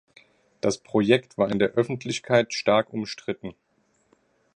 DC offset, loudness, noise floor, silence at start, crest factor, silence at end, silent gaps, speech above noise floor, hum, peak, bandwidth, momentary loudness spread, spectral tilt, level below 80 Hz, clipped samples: under 0.1%; -24 LUFS; -68 dBFS; 0.65 s; 20 dB; 1.05 s; none; 44 dB; none; -4 dBFS; 10 kHz; 11 LU; -5 dB/octave; -62 dBFS; under 0.1%